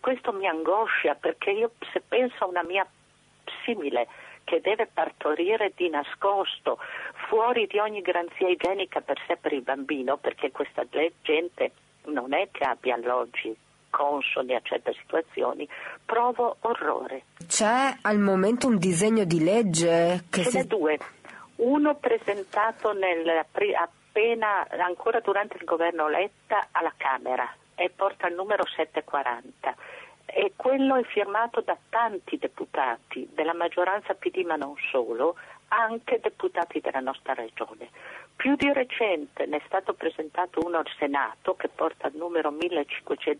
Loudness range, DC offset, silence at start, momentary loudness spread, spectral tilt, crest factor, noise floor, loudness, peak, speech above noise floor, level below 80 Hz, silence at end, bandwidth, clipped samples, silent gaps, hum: 5 LU; under 0.1%; 0.05 s; 10 LU; -4 dB/octave; 16 dB; -46 dBFS; -27 LUFS; -10 dBFS; 20 dB; -70 dBFS; 0 s; 11.5 kHz; under 0.1%; none; none